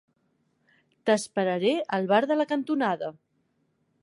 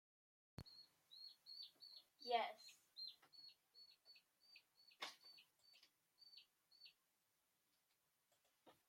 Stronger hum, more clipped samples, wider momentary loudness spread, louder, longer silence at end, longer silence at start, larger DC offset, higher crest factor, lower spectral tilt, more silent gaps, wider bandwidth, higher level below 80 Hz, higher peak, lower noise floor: neither; neither; second, 8 LU vs 22 LU; first, -26 LUFS vs -53 LUFS; first, 0.9 s vs 0.15 s; first, 1.05 s vs 0.6 s; neither; second, 20 dB vs 28 dB; first, -5 dB/octave vs -2.5 dB/octave; neither; second, 11.5 kHz vs 16 kHz; about the same, -80 dBFS vs -84 dBFS; first, -8 dBFS vs -28 dBFS; second, -72 dBFS vs -87 dBFS